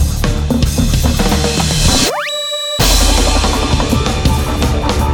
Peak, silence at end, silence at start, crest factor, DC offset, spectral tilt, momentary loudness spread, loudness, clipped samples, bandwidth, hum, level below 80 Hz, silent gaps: 0 dBFS; 0 s; 0 s; 12 dB; under 0.1%; -4 dB/octave; 5 LU; -13 LUFS; under 0.1%; 19.5 kHz; none; -16 dBFS; none